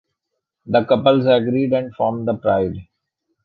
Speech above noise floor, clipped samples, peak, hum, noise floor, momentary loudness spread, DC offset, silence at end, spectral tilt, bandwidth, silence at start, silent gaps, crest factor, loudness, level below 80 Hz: 61 dB; under 0.1%; -2 dBFS; none; -78 dBFS; 7 LU; under 0.1%; 0.6 s; -9.5 dB/octave; 4.9 kHz; 0.65 s; none; 16 dB; -18 LUFS; -50 dBFS